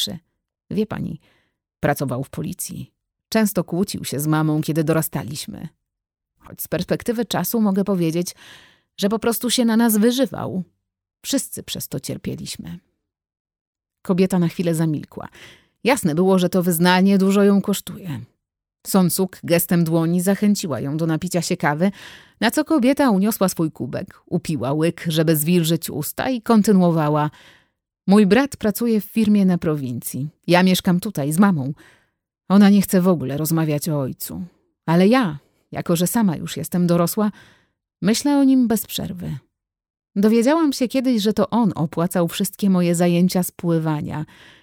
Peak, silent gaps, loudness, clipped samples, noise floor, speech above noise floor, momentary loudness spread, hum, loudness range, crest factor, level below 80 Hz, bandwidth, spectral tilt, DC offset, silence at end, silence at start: -2 dBFS; 13.40-13.45 s, 13.61-13.73 s, 39.90-39.94 s; -20 LUFS; under 0.1%; -80 dBFS; 61 dB; 14 LU; none; 6 LU; 18 dB; -54 dBFS; 19.5 kHz; -5.5 dB/octave; under 0.1%; 0.35 s; 0 s